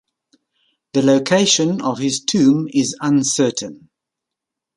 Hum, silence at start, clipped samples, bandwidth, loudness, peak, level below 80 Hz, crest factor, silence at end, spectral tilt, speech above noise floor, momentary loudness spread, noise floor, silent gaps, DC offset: none; 0.95 s; under 0.1%; 11.5 kHz; -17 LUFS; -2 dBFS; -62 dBFS; 16 dB; 1 s; -4 dB/octave; 67 dB; 6 LU; -83 dBFS; none; under 0.1%